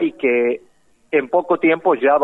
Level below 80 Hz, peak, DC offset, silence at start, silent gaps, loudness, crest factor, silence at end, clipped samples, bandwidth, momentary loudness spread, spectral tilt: -66 dBFS; -4 dBFS; under 0.1%; 0 s; none; -18 LUFS; 14 dB; 0 s; under 0.1%; 4 kHz; 6 LU; -7.5 dB/octave